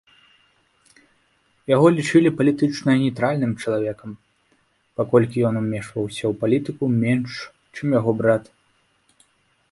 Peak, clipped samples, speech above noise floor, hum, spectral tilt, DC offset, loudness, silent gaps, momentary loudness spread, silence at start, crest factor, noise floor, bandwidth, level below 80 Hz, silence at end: -4 dBFS; under 0.1%; 44 dB; none; -7 dB/octave; under 0.1%; -21 LUFS; none; 14 LU; 1.7 s; 18 dB; -64 dBFS; 11.5 kHz; -58 dBFS; 1.3 s